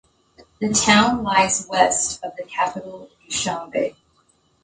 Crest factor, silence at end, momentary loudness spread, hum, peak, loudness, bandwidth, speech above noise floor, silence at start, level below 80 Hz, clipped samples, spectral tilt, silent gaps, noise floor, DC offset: 22 dB; 0.75 s; 14 LU; none; 0 dBFS; -20 LUFS; 9.6 kHz; 41 dB; 0.6 s; -52 dBFS; under 0.1%; -2.5 dB/octave; none; -62 dBFS; under 0.1%